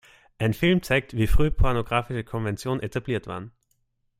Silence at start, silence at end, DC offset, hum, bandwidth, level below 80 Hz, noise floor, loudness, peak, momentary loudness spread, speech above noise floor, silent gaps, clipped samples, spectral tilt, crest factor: 0.4 s; 0.7 s; under 0.1%; none; 16 kHz; -32 dBFS; -71 dBFS; -25 LUFS; -8 dBFS; 9 LU; 48 dB; none; under 0.1%; -6.5 dB/octave; 16 dB